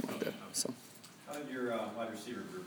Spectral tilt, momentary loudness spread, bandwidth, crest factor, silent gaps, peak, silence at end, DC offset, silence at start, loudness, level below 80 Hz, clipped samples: -3 dB/octave; 12 LU; over 20 kHz; 20 dB; none; -20 dBFS; 0 s; under 0.1%; 0 s; -40 LUFS; -88 dBFS; under 0.1%